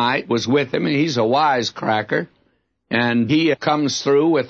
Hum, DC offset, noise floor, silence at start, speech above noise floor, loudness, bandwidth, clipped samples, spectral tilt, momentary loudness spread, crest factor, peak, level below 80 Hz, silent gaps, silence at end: none; under 0.1%; -65 dBFS; 0 s; 47 dB; -18 LUFS; 8 kHz; under 0.1%; -5 dB/octave; 5 LU; 14 dB; -4 dBFS; -62 dBFS; none; 0 s